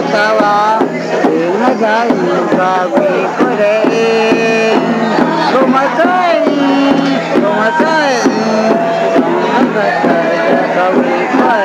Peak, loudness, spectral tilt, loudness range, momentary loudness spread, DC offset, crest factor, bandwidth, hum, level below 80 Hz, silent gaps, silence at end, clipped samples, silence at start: 0 dBFS; -11 LUFS; -5.5 dB/octave; 1 LU; 2 LU; under 0.1%; 10 dB; 11.5 kHz; none; -58 dBFS; none; 0 s; under 0.1%; 0 s